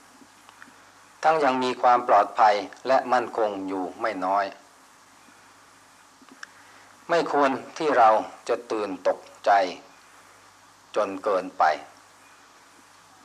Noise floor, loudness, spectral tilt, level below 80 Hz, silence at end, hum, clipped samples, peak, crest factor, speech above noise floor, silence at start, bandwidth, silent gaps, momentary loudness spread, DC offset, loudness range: -54 dBFS; -24 LUFS; -4 dB/octave; -76 dBFS; 1.4 s; none; under 0.1%; -8 dBFS; 18 dB; 31 dB; 1.2 s; 12.5 kHz; none; 12 LU; under 0.1%; 8 LU